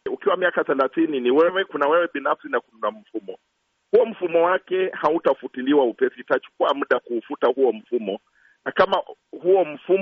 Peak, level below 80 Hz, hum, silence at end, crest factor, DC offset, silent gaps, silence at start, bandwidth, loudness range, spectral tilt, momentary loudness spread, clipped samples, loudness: -6 dBFS; -68 dBFS; none; 0 s; 16 dB; under 0.1%; none; 0.05 s; 5.8 kHz; 2 LU; -2.5 dB/octave; 10 LU; under 0.1%; -22 LUFS